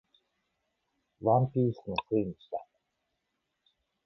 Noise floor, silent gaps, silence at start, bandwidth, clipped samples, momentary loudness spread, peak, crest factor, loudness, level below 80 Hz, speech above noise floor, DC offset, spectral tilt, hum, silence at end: -82 dBFS; none; 1.2 s; 5.8 kHz; under 0.1%; 15 LU; -14 dBFS; 20 dB; -30 LUFS; -64 dBFS; 53 dB; under 0.1%; -10 dB/octave; none; 1.4 s